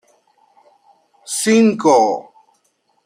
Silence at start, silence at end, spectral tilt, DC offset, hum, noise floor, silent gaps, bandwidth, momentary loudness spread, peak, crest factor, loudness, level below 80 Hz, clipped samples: 1.3 s; 0.85 s; -4 dB/octave; under 0.1%; none; -64 dBFS; none; 16 kHz; 12 LU; -2 dBFS; 16 dB; -15 LUFS; -66 dBFS; under 0.1%